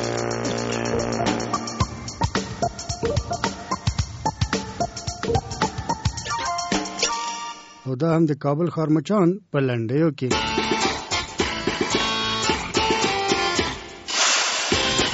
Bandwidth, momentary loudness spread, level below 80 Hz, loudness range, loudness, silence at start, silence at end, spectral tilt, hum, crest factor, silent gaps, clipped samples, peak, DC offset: 8.2 kHz; 7 LU; -40 dBFS; 5 LU; -23 LUFS; 0 s; 0 s; -4 dB/octave; none; 18 dB; none; under 0.1%; -6 dBFS; under 0.1%